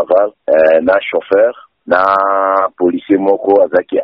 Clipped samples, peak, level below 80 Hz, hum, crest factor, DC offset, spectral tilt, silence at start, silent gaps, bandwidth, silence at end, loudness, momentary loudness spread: under 0.1%; 0 dBFS; -54 dBFS; none; 12 dB; under 0.1%; -8 dB/octave; 0 s; none; 5.2 kHz; 0 s; -12 LUFS; 5 LU